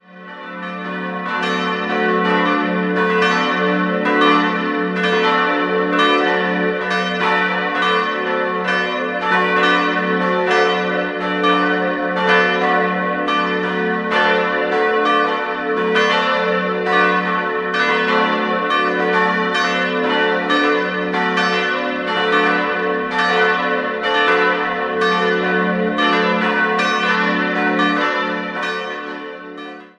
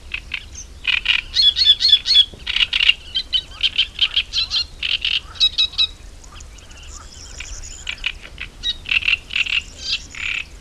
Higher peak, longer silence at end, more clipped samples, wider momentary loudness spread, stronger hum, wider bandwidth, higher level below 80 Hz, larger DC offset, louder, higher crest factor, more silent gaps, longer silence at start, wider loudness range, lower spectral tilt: about the same, -2 dBFS vs 0 dBFS; about the same, 0.1 s vs 0 s; neither; second, 5 LU vs 21 LU; neither; second, 10 kHz vs 14 kHz; second, -58 dBFS vs -38 dBFS; second, under 0.1% vs 0.2%; about the same, -17 LUFS vs -16 LUFS; about the same, 16 dB vs 20 dB; neither; about the same, 0.1 s vs 0.05 s; second, 1 LU vs 10 LU; first, -5 dB/octave vs 0.5 dB/octave